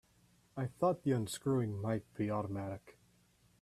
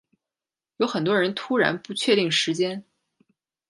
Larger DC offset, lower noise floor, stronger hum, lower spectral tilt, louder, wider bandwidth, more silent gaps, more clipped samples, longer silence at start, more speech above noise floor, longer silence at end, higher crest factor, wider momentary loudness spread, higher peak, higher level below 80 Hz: neither; second, -70 dBFS vs under -90 dBFS; first, 60 Hz at -60 dBFS vs none; first, -7 dB/octave vs -4 dB/octave; second, -37 LUFS vs -23 LUFS; first, 14.5 kHz vs 11.5 kHz; neither; neither; second, 0.55 s vs 0.8 s; second, 34 dB vs over 67 dB; second, 0.7 s vs 0.9 s; about the same, 18 dB vs 20 dB; first, 10 LU vs 7 LU; second, -20 dBFS vs -6 dBFS; about the same, -70 dBFS vs -74 dBFS